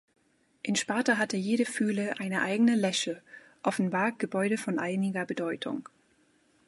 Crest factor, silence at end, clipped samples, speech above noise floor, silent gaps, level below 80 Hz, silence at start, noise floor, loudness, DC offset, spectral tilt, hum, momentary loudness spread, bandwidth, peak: 18 dB; 0.85 s; under 0.1%; 38 dB; none; -78 dBFS; 0.65 s; -67 dBFS; -29 LUFS; under 0.1%; -4.5 dB/octave; none; 9 LU; 11.5 kHz; -12 dBFS